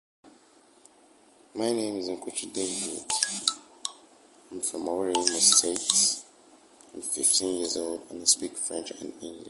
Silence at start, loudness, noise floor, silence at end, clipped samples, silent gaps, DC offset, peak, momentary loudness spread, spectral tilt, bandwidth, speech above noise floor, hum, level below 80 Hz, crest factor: 0.25 s; -26 LUFS; -59 dBFS; 0 s; under 0.1%; none; under 0.1%; -2 dBFS; 16 LU; -0.5 dB/octave; 12 kHz; 31 dB; none; -70 dBFS; 28 dB